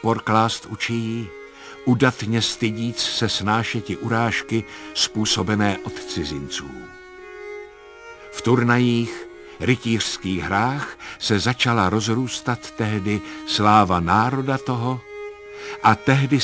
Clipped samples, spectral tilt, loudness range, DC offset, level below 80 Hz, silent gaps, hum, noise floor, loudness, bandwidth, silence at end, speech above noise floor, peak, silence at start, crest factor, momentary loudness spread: under 0.1%; -5 dB/octave; 5 LU; under 0.1%; -46 dBFS; none; none; -42 dBFS; -21 LUFS; 8 kHz; 0 s; 21 dB; -2 dBFS; 0 s; 20 dB; 18 LU